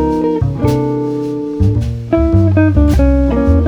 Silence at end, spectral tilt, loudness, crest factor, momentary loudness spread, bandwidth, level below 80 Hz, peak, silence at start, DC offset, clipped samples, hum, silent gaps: 0 s; -9 dB/octave; -13 LUFS; 12 dB; 7 LU; 12.5 kHz; -18 dBFS; 0 dBFS; 0 s; under 0.1%; under 0.1%; none; none